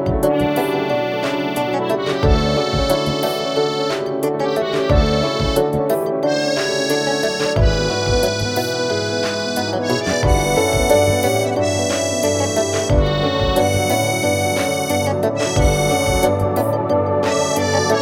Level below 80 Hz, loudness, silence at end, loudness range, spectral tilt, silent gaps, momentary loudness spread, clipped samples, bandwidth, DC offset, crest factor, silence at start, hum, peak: -28 dBFS; -18 LUFS; 0 s; 2 LU; -4.5 dB/octave; none; 4 LU; under 0.1%; 19 kHz; under 0.1%; 16 dB; 0 s; none; 0 dBFS